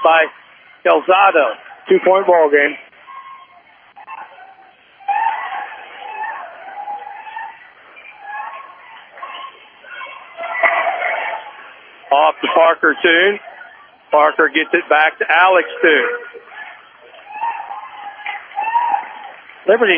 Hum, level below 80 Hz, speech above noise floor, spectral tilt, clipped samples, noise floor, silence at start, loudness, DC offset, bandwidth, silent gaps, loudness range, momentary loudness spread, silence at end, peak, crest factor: none; -76 dBFS; 34 dB; -6.5 dB/octave; under 0.1%; -47 dBFS; 0 s; -15 LUFS; under 0.1%; 4.9 kHz; none; 16 LU; 22 LU; 0 s; 0 dBFS; 18 dB